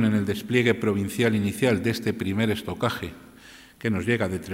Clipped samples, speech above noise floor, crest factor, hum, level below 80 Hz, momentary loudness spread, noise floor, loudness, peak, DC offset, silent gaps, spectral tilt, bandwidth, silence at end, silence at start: under 0.1%; 24 dB; 18 dB; none; -58 dBFS; 6 LU; -49 dBFS; -25 LUFS; -8 dBFS; under 0.1%; none; -6 dB/octave; 16 kHz; 0 s; 0 s